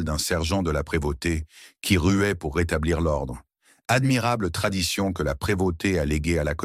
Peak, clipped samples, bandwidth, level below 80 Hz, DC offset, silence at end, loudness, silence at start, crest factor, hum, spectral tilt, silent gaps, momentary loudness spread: -8 dBFS; under 0.1%; 16 kHz; -36 dBFS; under 0.1%; 0 s; -24 LUFS; 0 s; 16 dB; none; -5 dB/octave; none; 8 LU